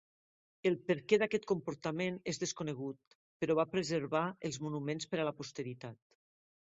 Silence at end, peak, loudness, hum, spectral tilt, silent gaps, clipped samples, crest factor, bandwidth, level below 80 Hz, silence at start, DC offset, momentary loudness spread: 0.8 s; -14 dBFS; -36 LUFS; none; -5 dB/octave; 3.07-3.40 s; under 0.1%; 22 dB; 7.6 kHz; -76 dBFS; 0.65 s; under 0.1%; 12 LU